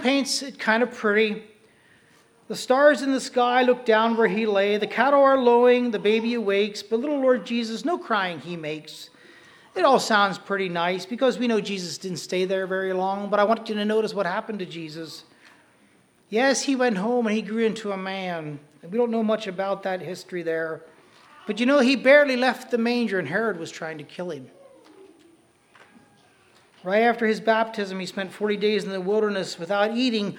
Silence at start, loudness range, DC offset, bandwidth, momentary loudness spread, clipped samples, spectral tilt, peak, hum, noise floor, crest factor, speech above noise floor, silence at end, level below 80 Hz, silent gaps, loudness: 0 s; 8 LU; under 0.1%; 15.5 kHz; 15 LU; under 0.1%; -4.5 dB/octave; -2 dBFS; none; -59 dBFS; 20 dB; 36 dB; 0 s; -78 dBFS; none; -23 LUFS